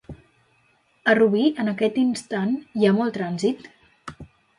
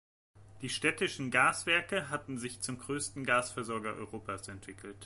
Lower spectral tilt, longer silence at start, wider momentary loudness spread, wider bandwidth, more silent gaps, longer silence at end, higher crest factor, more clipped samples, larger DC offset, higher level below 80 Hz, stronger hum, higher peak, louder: first, -6 dB/octave vs -3 dB/octave; second, 0.1 s vs 0.35 s; first, 21 LU vs 15 LU; about the same, 11.5 kHz vs 12 kHz; neither; first, 0.35 s vs 0 s; about the same, 18 dB vs 22 dB; neither; neither; first, -58 dBFS vs -64 dBFS; neither; first, -4 dBFS vs -14 dBFS; first, -22 LUFS vs -33 LUFS